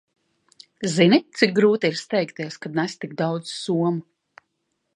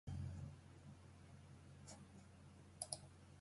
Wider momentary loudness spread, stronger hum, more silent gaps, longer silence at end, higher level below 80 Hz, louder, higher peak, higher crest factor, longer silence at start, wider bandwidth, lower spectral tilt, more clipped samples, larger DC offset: about the same, 12 LU vs 14 LU; neither; neither; first, 0.95 s vs 0 s; second, -72 dBFS vs -64 dBFS; first, -22 LUFS vs -56 LUFS; first, -2 dBFS vs -28 dBFS; second, 22 dB vs 28 dB; first, 0.8 s vs 0.05 s; about the same, 11 kHz vs 11.5 kHz; first, -5.5 dB/octave vs -4 dB/octave; neither; neither